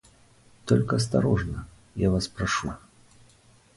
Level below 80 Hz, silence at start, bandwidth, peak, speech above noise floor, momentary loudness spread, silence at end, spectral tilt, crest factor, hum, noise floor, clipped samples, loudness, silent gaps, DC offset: -44 dBFS; 0.65 s; 11.5 kHz; -8 dBFS; 33 dB; 16 LU; 1 s; -6 dB/octave; 18 dB; none; -58 dBFS; under 0.1%; -26 LUFS; none; under 0.1%